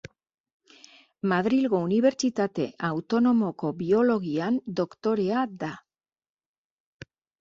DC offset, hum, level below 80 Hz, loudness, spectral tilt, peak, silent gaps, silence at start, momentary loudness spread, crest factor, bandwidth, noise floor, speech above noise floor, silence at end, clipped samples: under 0.1%; none; -66 dBFS; -26 LUFS; -6.5 dB/octave; -10 dBFS; none; 1.25 s; 9 LU; 16 dB; 7.6 kHz; -54 dBFS; 30 dB; 1.6 s; under 0.1%